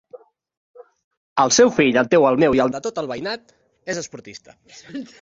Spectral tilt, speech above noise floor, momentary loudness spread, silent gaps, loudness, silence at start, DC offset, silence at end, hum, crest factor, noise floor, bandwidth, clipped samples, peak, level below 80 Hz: -3.5 dB/octave; 27 dB; 21 LU; 0.57-0.74 s, 1.04-1.11 s, 1.17-1.36 s; -18 LUFS; 0.15 s; under 0.1%; 0.15 s; none; 18 dB; -46 dBFS; 8 kHz; under 0.1%; -2 dBFS; -56 dBFS